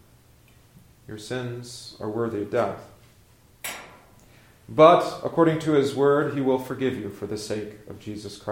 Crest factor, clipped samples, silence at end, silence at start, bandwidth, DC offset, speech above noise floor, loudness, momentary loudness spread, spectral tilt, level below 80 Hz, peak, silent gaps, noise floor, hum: 24 dB; under 0.1%; 0 s; 1.1 s; 16.5 kHz; under 0.1%; 32 dB; -23 LUFS; 21 LU; -6 dB/octave; -60 dBFS; -2 dBFS; none; -56 dBFS; none